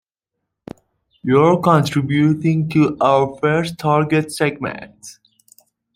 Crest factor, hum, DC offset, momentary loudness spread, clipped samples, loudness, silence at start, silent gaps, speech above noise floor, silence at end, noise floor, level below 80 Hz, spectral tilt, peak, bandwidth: 16 dB; none; under 0.1%; 13 LU; under 0.1%; -17 LUFS; 1.25 s; none; 63 dB; 0.85 s; -79 dBFS; -56 dBFS; -7 dB/octave; -2 dBFS; 15.5 kHz